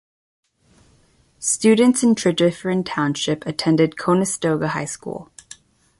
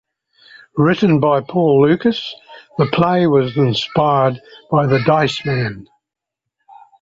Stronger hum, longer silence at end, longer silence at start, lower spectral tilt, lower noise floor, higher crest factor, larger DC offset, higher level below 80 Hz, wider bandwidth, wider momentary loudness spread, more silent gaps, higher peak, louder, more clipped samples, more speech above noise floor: neither; second, 0.75 s vs 1.2 s; first, 1.4 s vs 0.75 s; second, -4.5 dB/octave vs -7.5 dB/octave; second, -57 dBFS vs -82 dBFS; about the same, 16 dB vs 14 dB; neither; second, -58 dBFS vs -52 dBFS; first, 11.5 kHz vs 7.8 kHz; about the same, 13 LU vs 13 LU; neither; about the same, -4 dBFS vs -2 dBFS; second, -19 LUFS vs -16 LUFS; neither; second, 39 dB vs 67 dB